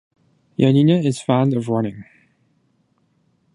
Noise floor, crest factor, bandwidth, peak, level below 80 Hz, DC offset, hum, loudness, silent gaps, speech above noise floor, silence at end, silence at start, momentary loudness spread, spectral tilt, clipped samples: -64 dBFS; 18 dB; 11 kHz; -2 dBFS; -62 dBFS; under 0.1%; none; -18 LUFS; none; 47 dB; 1.5 s; 0.6 s; 10 LU; -7.5 dB/octave; under 0.1%